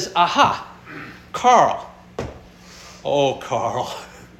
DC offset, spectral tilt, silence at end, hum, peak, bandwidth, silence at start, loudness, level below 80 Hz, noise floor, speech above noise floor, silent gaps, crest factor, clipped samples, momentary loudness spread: under 0.1%; -3.5 dB/octave; 0.15 s; none; -2 dBFS; 13.5 kHz; 0 s; -19 LUFS; -50 dBFS; -43 dBFS; 25 dB; none; 20 dB; under 0.1%; 21 LU